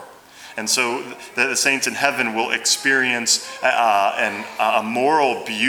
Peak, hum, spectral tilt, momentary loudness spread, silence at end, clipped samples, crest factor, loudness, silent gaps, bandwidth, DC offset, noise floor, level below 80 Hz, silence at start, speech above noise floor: 0 dBFS; none; -1 dB/octave; 6 LU; 0 s; under 0.1%; 20 dB; -18 LUFS; none; over 20 kHz; under 0.1%; -42 dBFS; -70 dBFS; 0 s; 22 dB